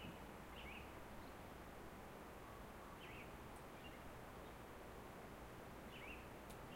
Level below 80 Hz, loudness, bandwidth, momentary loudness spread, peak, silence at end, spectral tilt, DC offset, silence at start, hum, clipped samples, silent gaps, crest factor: -64 dBFS; -56 LUFS; 16 kHz; 3 LU; -40 dBFS; 0 s; -5 dB/octave; under 0.1%; 0 s; none; under 0.1%; none; 16 dB